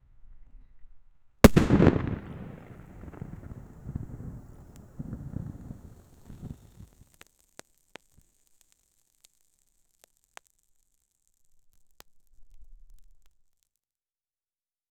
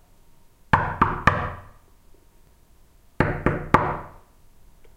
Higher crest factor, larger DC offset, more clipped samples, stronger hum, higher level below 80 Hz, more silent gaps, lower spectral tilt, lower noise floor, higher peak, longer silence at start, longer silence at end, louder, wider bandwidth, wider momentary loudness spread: first, 32 dB vs 26 dB; neither; neither; neither; about the same, -42 dBFS vs -38 dBFS; neither; about the same, -6.5 dB/octave vs -7 dB/octave; first, under -90 dBFS vs -54 dBFS; about the same, 0 dBFS vs 0 dBFS; second, 0.25 s vs 0.75 s; first, 1.95 s vs 0.1 s; about the same, -25 LUFS vs -23 LUFS; first, over 20 kHz vs 16 kHz; first, 28 LU vs 14 LU